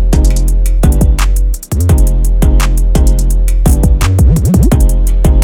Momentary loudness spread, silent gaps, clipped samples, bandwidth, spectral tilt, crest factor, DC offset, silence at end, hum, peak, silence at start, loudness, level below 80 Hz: 4 LU; none; under 0.1%; 17 kHz; -6.5 dB/octave; 8 dB; under 0.1%; 0 s; none; 0 dBFS; 0 s; -11 LUFS; -8 dBFS